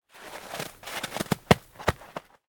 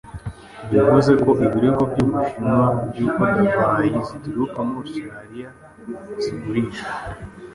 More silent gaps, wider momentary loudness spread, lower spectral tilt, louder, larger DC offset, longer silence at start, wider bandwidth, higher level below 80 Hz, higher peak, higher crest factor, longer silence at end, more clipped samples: neither; about the same, 19 LU vs 20 LU; second, -4.5 dB/octave vs -8 dB/octave; second, -29 LUFS vs -20 LUFS; neither; about the same, 0.15 s vs 0.05 s; first, 19 kHz vs 11.5 kHz; about the same, -48 dBFS vs -46 dBFS; about the same, -2 dBFS vs -2 dBFS; first, 28 dB vs 18 dB; first, 0.3 s vs 0 s; neither